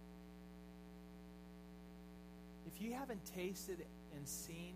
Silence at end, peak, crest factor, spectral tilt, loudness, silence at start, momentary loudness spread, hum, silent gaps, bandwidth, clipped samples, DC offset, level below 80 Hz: 0 s; -32 dBFS; 20 dB; -4.5 dB/octave; -52 LUFS; 0 s; 12 LU; none; none; 15.5 kHz; under 0.1%; under 0.1%; -64 dBFS